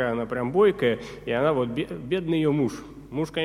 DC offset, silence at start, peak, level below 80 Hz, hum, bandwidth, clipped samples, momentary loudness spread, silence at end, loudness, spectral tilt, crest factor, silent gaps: under 0.1%; 0 s; -8 dBFS; -52 dBFS; none; 14.5 kHz; under 0.1%; 10 LU; 0 s; -25 LUFS; -7 dB/octave; 16 dB; none